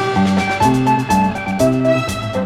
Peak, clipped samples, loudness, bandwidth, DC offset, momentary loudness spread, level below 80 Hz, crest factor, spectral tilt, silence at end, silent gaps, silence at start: 0 dBFS; under 0.1%; -16 LUFS; 15.5 kHz; under 0.1%; 4 LU; -40 dBFS; 14 dB; -6 dB/octave; 0 s; none; 0 s